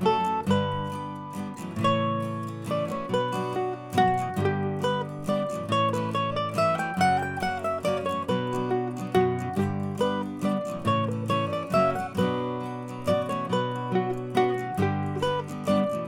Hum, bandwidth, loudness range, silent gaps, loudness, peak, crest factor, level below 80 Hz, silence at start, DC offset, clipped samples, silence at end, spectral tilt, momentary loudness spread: none; 17 kHz; 1 LU; none; -27 LUFS; -8 dBFS; 18 dB; -60 dBFS; 0 s; under 0.1%; under 0.1%; 0 s; -6.5 dB/octave; 6 LU